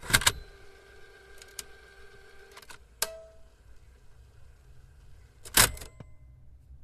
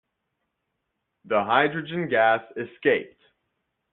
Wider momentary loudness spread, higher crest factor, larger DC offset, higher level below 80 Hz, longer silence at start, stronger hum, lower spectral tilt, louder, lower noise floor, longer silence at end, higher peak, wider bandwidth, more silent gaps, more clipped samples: first, 29 LU vs 7 LU; first, 30 dB vs 22 dB; neither; first, -48 dBFS vs -68 dBFS; second, 0 s vs 1.25 s; neither; second, -1 dB/octave vs -3 dB/octave; about the same, -25 LUFS vs -23 LUFS; second, -53 dBFS vs -79 dBFS; second, 0.1 s vs 0.85 s; about the same, -4 dBFS vs -4 dBFS; first, 14 kHz vs 4.2 kHz; neither; neither